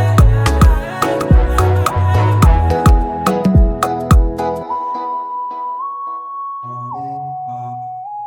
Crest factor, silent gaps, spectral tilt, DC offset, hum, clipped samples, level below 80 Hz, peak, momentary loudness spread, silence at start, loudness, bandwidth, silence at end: 14 dB; none; -7 dB/octave; under 0.1%; none; under 0.1%; -18 dBFS; 0 dBFS; 14 LU; 0 s; -15 LUFS; 17.5 kHz; 0 s